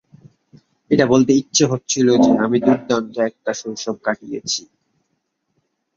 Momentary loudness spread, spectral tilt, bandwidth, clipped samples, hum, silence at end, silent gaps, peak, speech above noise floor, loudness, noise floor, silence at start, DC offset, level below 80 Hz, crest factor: 11 LU; -4.5 dB/octave; 7.6 kHz; under 0.1%; none; 1.35 s; none; 0 dBFS; 54 dB; -18 LUFS; -71 dBFS; 0.9 s; under 0.1%; -56 dBFS; 18 dB